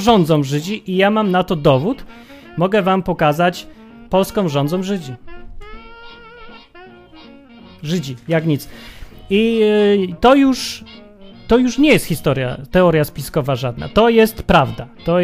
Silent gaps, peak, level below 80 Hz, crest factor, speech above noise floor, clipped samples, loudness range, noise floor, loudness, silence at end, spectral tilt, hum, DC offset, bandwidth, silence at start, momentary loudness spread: none; 0 dBFS; -38 dBFS; 16 dB; 26 dB; under 0.1%; 10 LU; -41 dBFS; -16 LUFS; 0 s; -6 dB/octave; none; under 0.1%; 15.5 kHz; 0 s; 11 LU